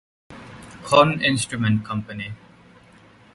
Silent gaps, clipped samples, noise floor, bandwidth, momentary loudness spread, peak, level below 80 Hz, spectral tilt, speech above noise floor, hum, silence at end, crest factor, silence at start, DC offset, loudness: none; under 0.1%; -51 dBFS; 11.5 kHz; 24 LU; 0 dBFS; -54 dBFS; -5 dB/octave; 30 dB; none; 1 s; 22 dB; 0.3 s; under 0.1%; -20 LUFS